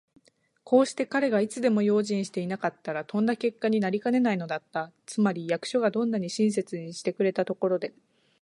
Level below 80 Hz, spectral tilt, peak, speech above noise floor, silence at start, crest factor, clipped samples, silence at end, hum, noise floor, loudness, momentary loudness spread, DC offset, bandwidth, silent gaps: -76 dBFS; -6 dB/octave; -8 dBFS; 37 dB; 0.65 s; 20 dB; under 0.1%; 0.5 s; none; -64 dBFS; -27 LUFS; 8 LU; under 0.1%; 11.5 kHz; none